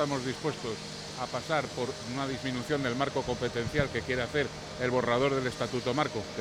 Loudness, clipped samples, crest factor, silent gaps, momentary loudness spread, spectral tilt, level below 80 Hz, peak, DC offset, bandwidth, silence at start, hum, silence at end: -31 LUFS; under 0.1%; 18 dB; none; 8 LU; -5 dB/octave; -54 dBFS; -14 dBFS; under 0.1%; 16 kHz; 0 s; none; 0 s